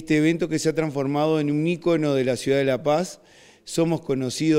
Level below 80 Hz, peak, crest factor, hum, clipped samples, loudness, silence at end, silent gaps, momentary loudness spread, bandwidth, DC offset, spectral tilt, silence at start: -58 dBFS; -8 dBFS; 14 dB; none; under 0.1%; -23 LUFS; 0 s; none; 4 LU; 16 kHz; under 0.1%; -6 dB/octave; 0 s